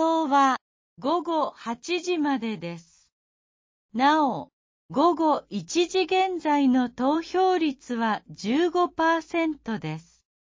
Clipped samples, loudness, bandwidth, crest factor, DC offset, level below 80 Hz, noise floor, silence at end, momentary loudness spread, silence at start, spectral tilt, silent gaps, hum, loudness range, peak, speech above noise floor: under 0.1%; -25 LUFS; 7.6 kHz; 16 dB; under 0.1%; -66 dBFS; under -90 dBFS; 0.5 s; 11 LU; 0 s; -4.5 dB/octave; 0.61-0.97 s, 3.12-3.89 s, 4.53-4.89 s; none; 4 LU; -10 dBFS; over 66 dB